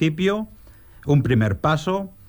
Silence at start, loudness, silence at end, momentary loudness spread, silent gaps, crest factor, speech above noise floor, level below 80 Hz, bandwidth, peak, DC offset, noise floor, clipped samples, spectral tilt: 0 s; -21 LUFS; 0.2 s; 12 LU; none; 14 dB; 26 dB; -44 dBFS; over 20 kHz; -8 dBFS; under 0.1%; -46 dBFS; under 0.1%; -7.5 dB/octave